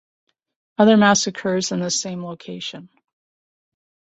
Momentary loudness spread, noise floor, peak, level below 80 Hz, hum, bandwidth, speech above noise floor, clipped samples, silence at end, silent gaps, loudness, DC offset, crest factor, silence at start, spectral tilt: 18 LU; under -90 dBFS; -2 dBFS; -64 dBFS; none; 8.2 kHz; over 71 dB; under 0.1%; 1.3 s; none; -18 LUFS; under 0.1%; 20 dB; 0.8 s; -4 dB/octave